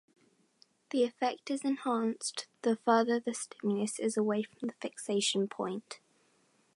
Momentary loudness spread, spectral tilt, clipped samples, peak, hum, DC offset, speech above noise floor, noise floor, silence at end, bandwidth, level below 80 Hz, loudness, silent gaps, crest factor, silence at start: 11 LU; -4 dB/octave; under 0.1%; -12 dBFS; none; under 0.1%; 38 dB; -70 dBFS; 0.8 s; 11.5 kHz; -86 dBFS; -33 LUFS; none; 22 dB; 0.95 s